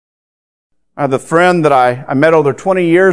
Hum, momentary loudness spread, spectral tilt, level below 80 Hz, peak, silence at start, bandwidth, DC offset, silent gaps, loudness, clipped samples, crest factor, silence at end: none; 7 LU; -6.5 dB/octave; -58 dBFS; 0 dBFS; 0.95 s; 11 kHz; 0.6%; none; -11 LUFS; 0.2%; 12 dB; 0 s